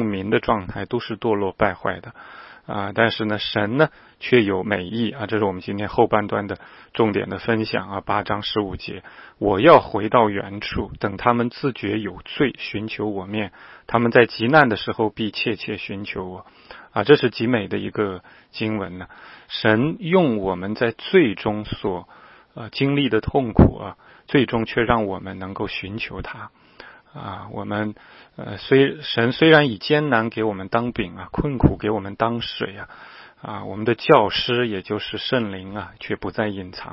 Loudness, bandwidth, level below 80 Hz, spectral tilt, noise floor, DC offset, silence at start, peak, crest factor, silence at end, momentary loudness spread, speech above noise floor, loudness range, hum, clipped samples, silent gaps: -21 LUFS; 5.8 kHz; -42 dBFS; -9 dB/octave; -46 dBFS; under 0.1%; 0 s; 0 dBFS; 22 dB; 0 s; 17 LU; 24 dB; 5 LU; none; under 0.1%; none